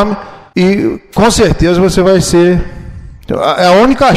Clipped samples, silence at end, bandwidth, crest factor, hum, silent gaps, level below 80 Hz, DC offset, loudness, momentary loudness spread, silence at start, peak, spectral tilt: under 0.1%; 0 s; 14.5 kHz; 10 dB; none; none; -26 dBFS; under 0.1%; -10 LUFS; 14 LU; 0 s; 0 dBFS; -5.5 dB/octave